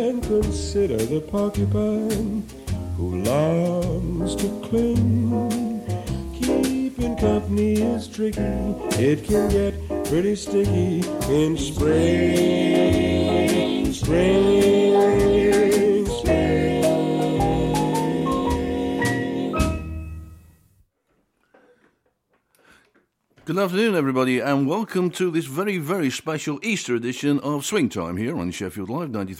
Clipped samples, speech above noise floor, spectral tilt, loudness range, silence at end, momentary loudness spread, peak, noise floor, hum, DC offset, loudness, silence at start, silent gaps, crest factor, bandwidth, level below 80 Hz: under 0.1%; 48 dB; -6 dB/octave; 7 LU; 0 s; 10 LU; -8 dBFS; -69 dBFS; none; under 0.1%; -22 LUFS; 0 s; none; 14 dB; 16.5 kHz; -36 dBFS